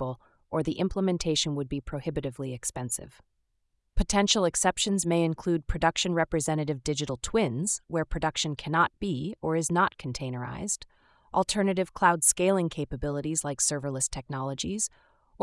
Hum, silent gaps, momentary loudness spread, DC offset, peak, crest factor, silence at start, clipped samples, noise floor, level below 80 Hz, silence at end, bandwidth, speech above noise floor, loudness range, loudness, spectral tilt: none; none; 10 LU; under 0.1%; -8 dBFS; 22 dB; 0 s; under 0.1%; -75 dBFS; -44 dBFS; 0 s; 12 kHz; 47 dB; 4 LU; -28 LUFS; -4 dB/octave